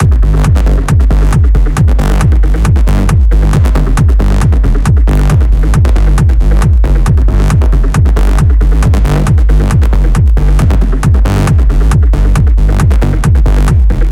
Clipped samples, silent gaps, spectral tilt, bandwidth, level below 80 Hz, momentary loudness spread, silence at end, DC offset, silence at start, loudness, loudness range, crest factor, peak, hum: under 0.1%; none; -7 dB/octave; 12 kHz; -8 dBFS; 1 LU; 0 s; under 0.1%; 0 s; -10 LUFS; 0 LU; 6 dB; 0 dBFS; none